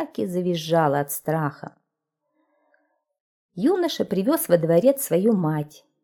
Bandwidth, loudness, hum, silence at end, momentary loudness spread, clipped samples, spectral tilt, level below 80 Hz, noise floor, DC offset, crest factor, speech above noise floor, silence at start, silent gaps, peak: 19 kHz; -22 LUFS; none; 0.35 s; 11 LU; under 0.1%; -6 dB/octave; -70 dBFS; -80 dBFS; under 0.1%; 20 dB; 58 dB; 0 s; 3.20-3.49 s; -4 dBFS